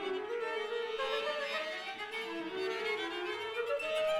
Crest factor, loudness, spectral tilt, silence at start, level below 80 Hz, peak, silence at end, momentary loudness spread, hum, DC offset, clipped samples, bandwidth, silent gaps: 12 dB; -36 LUFS; -2.5 dB/octave; 0 s; -74 dBFS; -24 dBFS; 0 s; 5 LU; none; under 0.1%; under 0.1%; 16 kHz; none